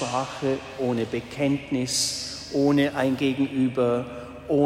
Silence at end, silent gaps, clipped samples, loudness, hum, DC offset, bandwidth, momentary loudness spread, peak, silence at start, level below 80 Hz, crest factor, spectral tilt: 0 s; none; under 0.1%; -25 LUFS; none; under 0.1%; 16 kHz; 7 LU; -10 dBFS; 0 s; -54 dBFS; 16 dB; -4.5 dB/octave